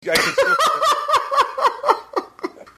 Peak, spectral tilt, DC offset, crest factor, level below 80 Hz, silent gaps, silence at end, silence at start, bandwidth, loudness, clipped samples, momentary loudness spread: 0 dBFS; -1.5 dB/octave; under 0.1%; 18 dB; -58 dBFS; none; 0.15 s; 0.05 s; 14 kHz; -18 LUFS; under 0.1%; 11 LU